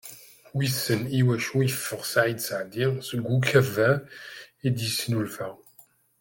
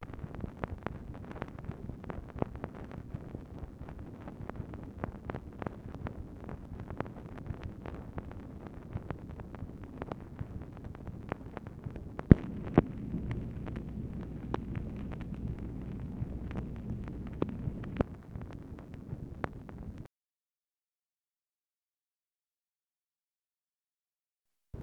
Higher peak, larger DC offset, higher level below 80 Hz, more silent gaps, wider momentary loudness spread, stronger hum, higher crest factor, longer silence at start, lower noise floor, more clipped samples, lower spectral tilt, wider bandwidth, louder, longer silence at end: second, -6 dBFS vs 0 dBFS; neither; second, -66 dBFS vs -46 dBFS; second, none vs 20.64-20.68 s, 20.83-20.88 s, 22.27-22.31 s, 23.06-23.10 s; first, 15 LU vs 9 LU; neither; second, 20 dB vs 38 dB; about the same, 0.05 s vs 0 s; second, -58 dBFS vs under -90 dBFS; neither; second, -5 dB/octave vs -9.5 dB/octave; first, 17 kHz vs 8.8 kHz; first, -26 LUFS vs -39 LUFS; first, 0.65 s vs 0 s